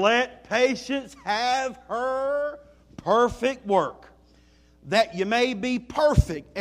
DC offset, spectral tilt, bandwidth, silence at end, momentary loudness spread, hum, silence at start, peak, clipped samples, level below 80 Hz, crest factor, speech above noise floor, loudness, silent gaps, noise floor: under 0.1%; -5 dB/octave; 15 kHz; 0 s; 9 LU; none; 0 s; -6 dBFS; under 0.1%; -40 dBFS; 20 dB; 33 dB; -25 LUFS; none; -57 dBFS